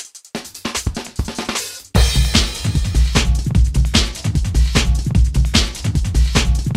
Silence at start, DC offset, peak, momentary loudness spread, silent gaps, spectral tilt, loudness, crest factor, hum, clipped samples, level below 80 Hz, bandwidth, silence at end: 0 s; under 0.1%; 0 dBFS; 9 LU; none; -4 dB/octave; -18 LUFS; 16 dB; none; under 0.1%; -18 dBFS; 16 kHz; 0 s